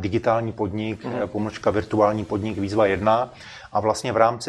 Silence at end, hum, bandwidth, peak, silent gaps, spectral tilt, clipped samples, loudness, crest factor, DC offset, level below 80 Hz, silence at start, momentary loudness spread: 0 s; none; 12.5 kHz; -2 dBFS; none; -6 dB/octave; under 0.1%; -23 LUFS; 20 dB; under 0.1%; -50 dBFS; 0 s; 8 LU